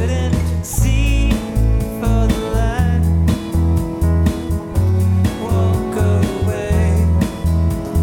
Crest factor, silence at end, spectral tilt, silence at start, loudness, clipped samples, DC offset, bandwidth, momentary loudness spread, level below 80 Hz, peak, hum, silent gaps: 14 dB; 0 s; -7 dB/octave; 0 s; -17 LUFS; under 0.1%; under 0.1%; 16.5 kHz; 3 LU; -20 dBFS; -2 dBFS; none; none